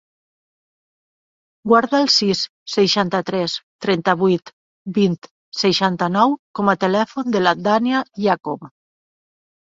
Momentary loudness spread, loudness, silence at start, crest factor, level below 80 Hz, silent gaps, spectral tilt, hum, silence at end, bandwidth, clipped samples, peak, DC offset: 10 LU; -18 LUFS; 1.65 s; 18 dB; -62 dBFS; 2.49-2.66 s, 3.63-3.79 s, 4.53-4.85 s, 5.31-5.52 s, 6.39-6.54 s; -5 dB/octave; none; 1.05 s; 7.8 kHz; under 0.1%; -2 dBFS; under 0.1%